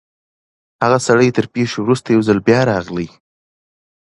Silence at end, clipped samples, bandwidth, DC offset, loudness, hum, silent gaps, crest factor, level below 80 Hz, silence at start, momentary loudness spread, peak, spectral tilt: 1.05 s; under 0.1%; 11.5 kHz; under 0.1%; -15 LUFS; none; none; 16 dB; -50 dBFS; 0.8 s; 10 LU; 0 dBFS; -6 dB/octave